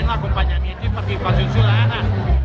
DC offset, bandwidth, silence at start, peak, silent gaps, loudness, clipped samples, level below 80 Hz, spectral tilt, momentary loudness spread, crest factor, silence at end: under 0.1%; 6.4 kHz; 0 s; -2 dBFS; none; -19 LUFS; under 0.1%; -22 dBFS; -8 dB/octave; 7 LU; 14 dB; 0 s